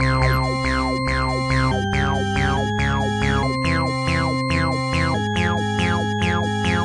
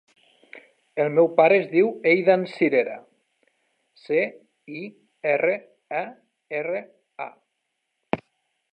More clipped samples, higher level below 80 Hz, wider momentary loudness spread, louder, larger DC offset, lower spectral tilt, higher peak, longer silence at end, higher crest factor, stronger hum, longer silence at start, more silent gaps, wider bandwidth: neither; first, -32 dBFS vs -72 dBFS; second, 1 LU vs 19 LU; first, -20 LUFS vs -23 LUFS; neither; second, -5.5 dB/octave vs -8 dB/octave; about the same, -6 dBFS vs -4 dBFS; second, 0 s vs 0.55 s; second, 14 dB vs 20 dB; neither; second, 0 s vs 0.55 s; neither; first, 12 kHz vs 5.4 kHz